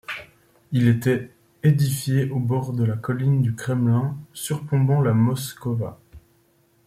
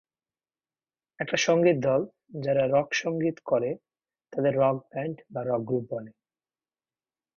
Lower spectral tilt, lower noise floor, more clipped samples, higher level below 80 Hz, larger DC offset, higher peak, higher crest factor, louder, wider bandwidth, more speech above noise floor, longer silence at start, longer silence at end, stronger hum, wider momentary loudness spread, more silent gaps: first, -7 dB/octave vs -5.5 dB/octave; second, -61 dBFS vs under -90 dBFS; neither; first, -58 dBFS vs -68 dBFS; neither; first, -6 dBFS vs -10 dBFS; about the same, 16 dB vs 18 dB; first, -22 LUFS vs -27 LUFS; first, 16 kHz vs 7.2 kHz; second, 40 dB vs over 64 dB; second, 0.1 s vs 1.2 s; second, 0.65 s vs 1.25 s; neither; second, 10 LU vs 14 LU; neither